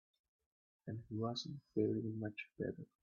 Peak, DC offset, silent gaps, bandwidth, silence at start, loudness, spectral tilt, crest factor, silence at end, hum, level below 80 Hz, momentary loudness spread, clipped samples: -24 dBFS; under 0.1%; none; 6.8 kHz; 0.85 s; -43 LUFS; -6 dB/octave; 20 dB; 0.2 s; none; -76 dBFS; 11 LU; under 0.1%